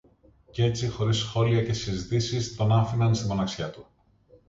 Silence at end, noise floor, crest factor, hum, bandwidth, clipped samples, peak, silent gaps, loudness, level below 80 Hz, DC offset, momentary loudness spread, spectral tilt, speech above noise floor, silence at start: 0.65 s; -59 dBFS; 16 dB; none; 7.8 kHz; under 0.1%; -10 dBFS; none; -26 LUFS; -48 dBFS; under 0.1%; 7 LU; -6 dB/octave; 34 dB; 0.55 s